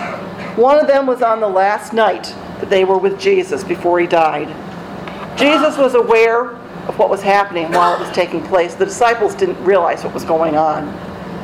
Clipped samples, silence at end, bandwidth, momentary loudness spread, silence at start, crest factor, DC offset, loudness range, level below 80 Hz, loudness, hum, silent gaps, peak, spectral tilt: under 0.1%; 0 s; 14.5 kHz; 15 LU; 0 s; 14 dB; under 0.1%; 2 LU; -50 dBFS; -14 LUFS; none; none; -2 dBFS; -5 dB/octave